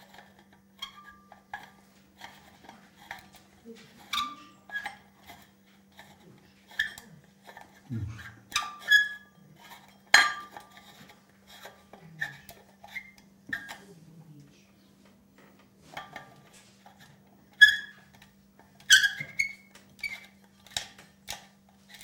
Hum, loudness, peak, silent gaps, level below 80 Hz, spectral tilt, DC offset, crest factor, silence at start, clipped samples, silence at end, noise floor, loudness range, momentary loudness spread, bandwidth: none; -26 LUFS; -2 dBFS; none; -68 dBFS; 0 dB/octave; under 0.1%; 32 dB; 0.8 s; under 0.1%; 0.65 s; -60 dBFS; 20 LU; 29 LU; 17.5 kHz